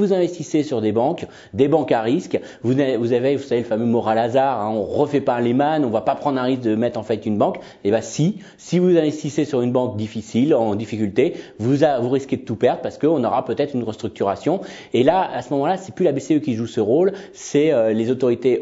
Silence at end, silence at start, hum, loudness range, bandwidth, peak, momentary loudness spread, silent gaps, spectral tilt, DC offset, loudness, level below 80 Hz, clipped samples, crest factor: 0 s; 0 s; none; 1 LU; 8 kHz; -2 dBFS; 6 LU; none; -7 dB/octave; under 0.1%; -20 LUFS; -60 dBFS; under 0.1%; 16 dB